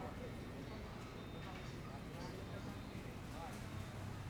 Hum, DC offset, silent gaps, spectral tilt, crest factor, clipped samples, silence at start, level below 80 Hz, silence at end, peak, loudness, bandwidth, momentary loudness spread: none; under 0.1%; none; -6 dB/octave; 12 dB; under 0.1%; 0 s; -58 dBFS; 0 s; -36 dBFS; -49 LUFS; over 20 kHz; 2 LU